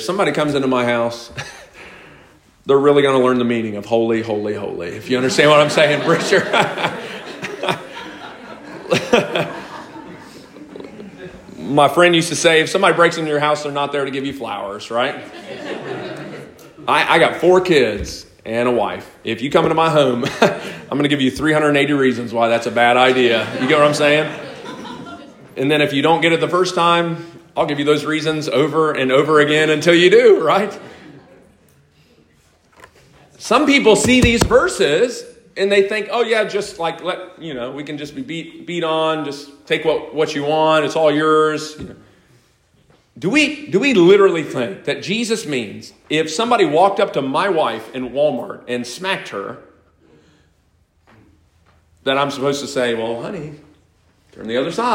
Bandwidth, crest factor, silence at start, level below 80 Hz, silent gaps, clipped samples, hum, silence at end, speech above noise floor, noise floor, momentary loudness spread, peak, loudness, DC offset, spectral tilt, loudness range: 16 kHz; 18 dB; 0 s; -46 dBFS; none; under 0.1%; none; 0 s; 42 dB; -59 dBFS; 19 LU; 0 dBFS; -16 LUFS; under 0.1%; -4.5 dB/octave; 8 LU